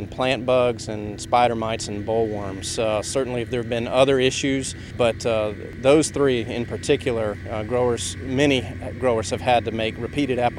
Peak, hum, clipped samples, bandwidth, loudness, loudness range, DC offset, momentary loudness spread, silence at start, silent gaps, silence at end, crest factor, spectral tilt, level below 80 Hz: -2 dBFS; none; under 0.1%; 14 kHz; -22 LUFS; 2 LU; under 0.1%; 9 LU; 0 s; none; 0 s; 20 dB; -4.5 dB/octave; -44 dBFS